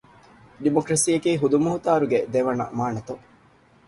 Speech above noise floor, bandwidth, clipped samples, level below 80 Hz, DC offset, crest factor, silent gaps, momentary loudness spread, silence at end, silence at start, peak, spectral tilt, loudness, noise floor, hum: 34 dB; 11.5 kHz; under 0.1%; -58 dBFS; under 0.1%; 18 dB; none; 9 LU; 0.7 s; 0.6 s; -6 dBFS; -5 dB/octave; -22 LUFS; -56 dBFS; none